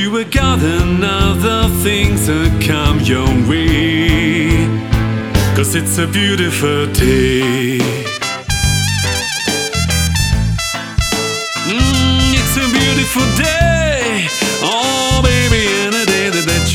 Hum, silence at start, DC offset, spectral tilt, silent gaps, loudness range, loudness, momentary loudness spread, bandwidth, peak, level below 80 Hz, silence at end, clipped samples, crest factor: none; 0 s; under 0.1%; -4 dB/octave; none; 2 LU; -13 LUFS; 4 LU; over 20 kHz; 0 dBFS; -22 dBFS; 0 s; under 0.1%; 14 dB